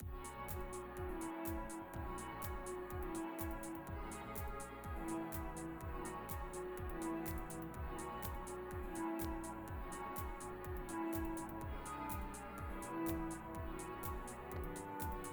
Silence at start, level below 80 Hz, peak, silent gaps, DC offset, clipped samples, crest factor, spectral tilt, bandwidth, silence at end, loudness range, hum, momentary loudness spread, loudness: 0 s; -52 dBFS; -28 dBFS; none; under 0.1%; under 0.1%; 18 dB; -5.5 dB/octave; over 20 kHz; 0 s; 1 LU; none; 5 LU; -46 LUFS